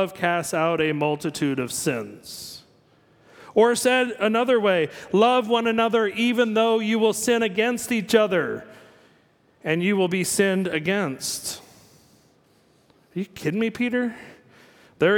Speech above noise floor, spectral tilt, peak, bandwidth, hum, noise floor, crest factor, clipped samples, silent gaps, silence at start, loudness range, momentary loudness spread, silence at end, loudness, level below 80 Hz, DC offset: 38 dB; -4 dB/octave; -4 dBFS; 18.5 kHz; none; -60 dBFS; 20 dB; under 0.1%; none; 0 s; 9 LU; 13 LU; 0 s; -22 LUFS; -66 dBFS; under 0.1%